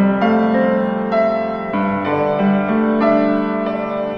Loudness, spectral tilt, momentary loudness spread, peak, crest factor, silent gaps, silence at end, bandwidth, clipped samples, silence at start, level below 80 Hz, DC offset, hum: -17 LUFS; -9.5 dB/octave; 6 LU; -4 dBFS; 12 dB; none; 0 s; 5.8 kHz; under 0.1%; 0 s; -52 dBFS; under 0.1%; none